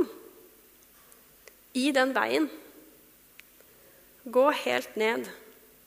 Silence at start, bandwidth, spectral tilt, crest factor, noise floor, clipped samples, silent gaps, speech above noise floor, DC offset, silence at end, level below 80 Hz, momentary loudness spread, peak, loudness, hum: 0 s; 15.5 kHz; -3 dB/octave; 22 dB; -57 dBFS; under 0.1%; none; 31 dB; under 0.1%; 0.45 s; -74 dBFS; 23 LU; -8 dBFS; -27 LUFS; none